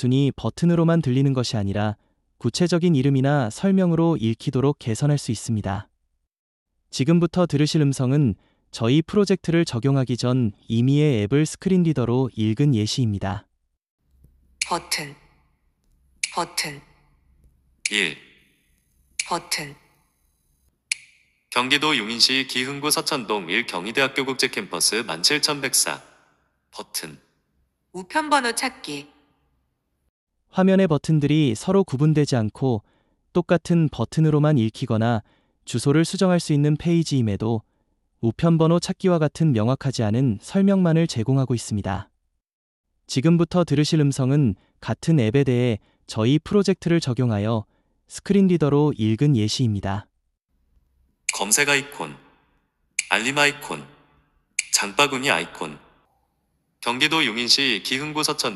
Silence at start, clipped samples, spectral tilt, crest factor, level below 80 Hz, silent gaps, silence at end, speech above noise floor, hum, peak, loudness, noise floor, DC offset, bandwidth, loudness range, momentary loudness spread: 0 s; under 0.1%; -5 dB/octave; 22 dB; -54 dBFS; 6.39-6.66 s, 13.90-13.98 s, 30.09-30.27 s, 42.53-42.84 s; 0 s; 51 dB; none; 0 dBFS; -21 LUFS; -72 dBFS; under 0.1%; 13 kHz; 7 LU; 11 LU